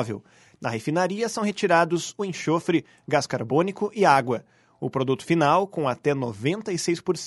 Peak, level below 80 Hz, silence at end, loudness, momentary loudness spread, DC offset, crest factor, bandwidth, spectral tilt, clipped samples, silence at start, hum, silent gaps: -4 dBFS; -66 dBFS; 0 s; -24 LUFS; 10 LU; under 0.1%; 20 dB; 11.5 kHz; -5 dB/octave; under 0.1%; 0 s; none; none